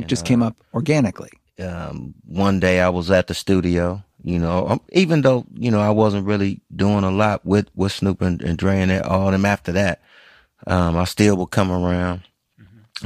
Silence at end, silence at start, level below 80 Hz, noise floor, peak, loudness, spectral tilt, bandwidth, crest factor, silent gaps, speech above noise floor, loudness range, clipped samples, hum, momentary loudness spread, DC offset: 0 s; 0 s; -42 dBFS; -51 dBFS; -2 dBFS; -19 LUFS; -6.5 dB/octave; 15 kHz; 16 dB; none; 32 dB; 2 LU; under 0.1%; none; 13 LU; under 0.1%